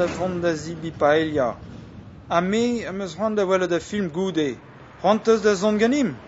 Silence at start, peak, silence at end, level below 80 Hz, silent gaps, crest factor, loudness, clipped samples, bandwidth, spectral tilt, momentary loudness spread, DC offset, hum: 0 s; -4 dBFS; 0 s; -52 dBFS; none; 18 dB; -22 LUFS; under 0.1%; 8 kHz; -5.5 dB/octave; 15 LU; under 0.1%; none